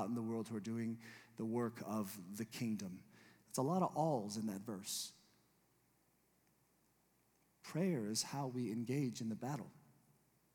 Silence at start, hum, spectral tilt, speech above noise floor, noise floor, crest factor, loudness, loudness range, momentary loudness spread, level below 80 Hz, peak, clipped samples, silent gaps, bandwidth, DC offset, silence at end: 0 s; none; -5 dB/octave; 35 dB; -77 dBFS; 20 dB; -42 LUFS; 6 LU; 11 LU; -90 dBFS; -24 dBFS; under 0.1%; none; 19 kHz; under 0.1%; 0.75 s